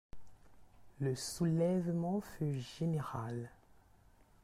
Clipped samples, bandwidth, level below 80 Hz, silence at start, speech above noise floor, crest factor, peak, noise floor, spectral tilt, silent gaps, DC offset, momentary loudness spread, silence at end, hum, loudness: under 0.1%; 14.5 kHz; -64 dBFS; 0.15 s; 29 dB; 14 dB; -24 dBFS; -65 dBFS; -6.5 dB/octave; none; under 0.1%; 9 LU; 0.9 s; none; -37 LUFS